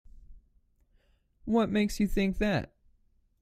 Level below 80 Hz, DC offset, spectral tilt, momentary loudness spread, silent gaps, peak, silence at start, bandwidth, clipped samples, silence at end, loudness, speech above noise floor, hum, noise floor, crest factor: -44 dBFS; under 0.1%; -6 dB/octave; 12 LU; none; -14 dBFS; 0.15 s; 15 kHz; under 0.1%; 0.75 s; -29 LUFS; 40 dB; none; -67 dBFS; 16 dB